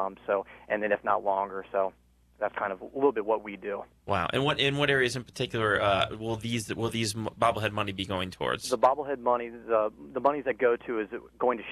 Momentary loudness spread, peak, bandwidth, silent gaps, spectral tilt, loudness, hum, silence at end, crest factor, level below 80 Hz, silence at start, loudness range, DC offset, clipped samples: 8 LU; -10 dBFS; 13 kHz; none; -4.5 dB/octave; -29 LUFS; none; 0 s; 20 dB; -58 dBFS; 0 s; 3 LU; under 0.1%; under 0.1%